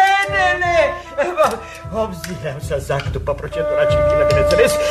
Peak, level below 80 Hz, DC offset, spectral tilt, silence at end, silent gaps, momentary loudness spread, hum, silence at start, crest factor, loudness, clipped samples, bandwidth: -2 dBFS; -32 dBFS; under 0.1%; -4.5 dB/octave; 0 s; none; 11 LU; none; 0 s; 14 dB; -17 LUFS; under 0.1%; 14 kHz